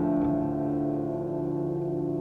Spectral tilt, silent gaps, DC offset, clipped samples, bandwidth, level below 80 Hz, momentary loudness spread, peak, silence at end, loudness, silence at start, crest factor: -11.5 dB/octave; none; under 0.1%; under 0.1%; 2.8 kHz; -52 dBFS; 4 LU; -16 dBFS; 0 s; -29 LUFS; 0 s; 12 dB